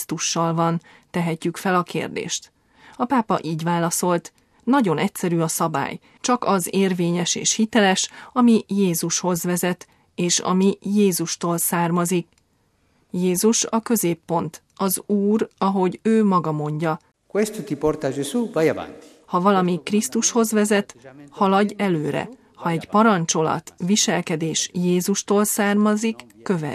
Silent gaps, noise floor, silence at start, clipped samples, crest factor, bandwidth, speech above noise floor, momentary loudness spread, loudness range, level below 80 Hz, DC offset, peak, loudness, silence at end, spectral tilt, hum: none; -64 dBFS; 0 s; under 0.1%; 18 dB; 15 kHz; 43 dB; 9 LU; 3 LU; -60 dBFS; under 0.1%; -4 dBFS; -21 LUFS; 0 s; -4.5 dB/octave; none